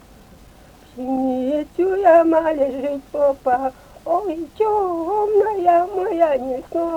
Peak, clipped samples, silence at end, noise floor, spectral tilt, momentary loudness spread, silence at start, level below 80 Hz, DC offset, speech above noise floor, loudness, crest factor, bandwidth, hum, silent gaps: -4 dBFS; under 0.1%; 0 s; -46 dBFS; -6.5 dB/octave; 12 LU; 0.95 s; -50 dBFS; under 0.1%; 28 dB; -19 LUFS; 16 dB; 15.5 kHz; none; none